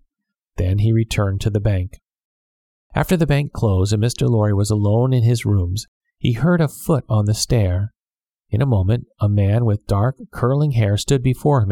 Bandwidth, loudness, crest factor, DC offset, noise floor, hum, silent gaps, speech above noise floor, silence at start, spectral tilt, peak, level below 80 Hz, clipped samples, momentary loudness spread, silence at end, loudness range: 15.5 kHz; -19 LUFS; 16 dB; under 0.1%; under -90 dBFS; none; 2.24-2.90 s, 5.88-6.01 s, 8.07-8.11 s; over 73 dB; 0.55 s; -6.5 dB/octave; -2 dBFS; -36 dBFS; under 0.1%; 7 LU; 0 s; 2 LU